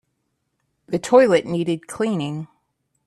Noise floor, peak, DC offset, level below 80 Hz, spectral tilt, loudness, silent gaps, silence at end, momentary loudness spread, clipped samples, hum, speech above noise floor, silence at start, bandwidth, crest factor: -73 dBFS; 0 dBFS; under 0.1%; -62 dBFS; -6 dB/octave; -20 LUFS; none; 0.6 s; 15 LU; under 0.1%; none; 54 dB; 0.9 s; 12.5 kHz; 20 dB